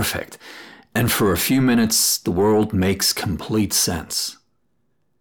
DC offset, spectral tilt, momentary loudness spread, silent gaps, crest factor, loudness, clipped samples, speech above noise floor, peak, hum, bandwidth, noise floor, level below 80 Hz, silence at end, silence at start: under 0.1%; -3.5 dB/octave; 12 LU; none; 14 dB; -19 LUFS; under 0.1%; 51 dB; -6 dBFS; none; over 20 kHz; -70 dBFS; -46 dBFS; 0.9 s; 0 s